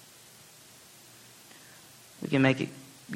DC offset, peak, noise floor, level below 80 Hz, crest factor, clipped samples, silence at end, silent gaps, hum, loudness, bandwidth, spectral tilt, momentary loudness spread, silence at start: under 0.1%; -8 dBFS; -54 dBFS; -70 dBFS; 26 dB; under 0.1%; 0 s; none; none; -28 LUFS; 16.5 kHz; -6 dB/octave; 26 LU; 2.2 s